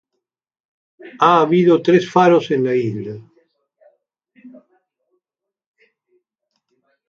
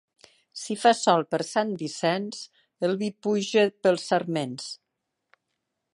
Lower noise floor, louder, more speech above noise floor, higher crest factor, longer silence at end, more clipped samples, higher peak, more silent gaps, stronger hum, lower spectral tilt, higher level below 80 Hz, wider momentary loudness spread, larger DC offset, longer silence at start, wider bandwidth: about the same, -84 dBFS vs -82 dBFS; first, -15 LUFS vs -25 LUFS; first, 69 dB vs 57 dB; about the same, 20 dB vs 22 dB; first, 2.6 s vs 1.2 s; neither; first, 0 dBFS vs -4 dBFS; neither; neither; first, -7 dB/octave vs -4.5 dB/octave; first, -68 dBFS vs -78 dBFS; about the same, 15 LU vs 17 LU; neither; first, 1.05 s vs 0.55 s; second, 7.2 kHz vs 11.5 kHz